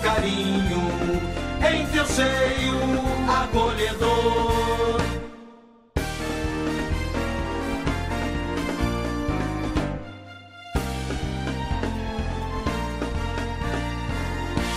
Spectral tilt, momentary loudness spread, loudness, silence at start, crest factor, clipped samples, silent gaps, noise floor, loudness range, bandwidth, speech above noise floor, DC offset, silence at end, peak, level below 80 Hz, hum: -5 dB/octave; 8 LU; -25 LUFS; 0 s; 16 dB; under 0.1%; none; -50 dBFS; 7 LU; 15.5 kHz; 27 dB; under 0.1%; 0 s; -8 dBFS; -32 dBFS; none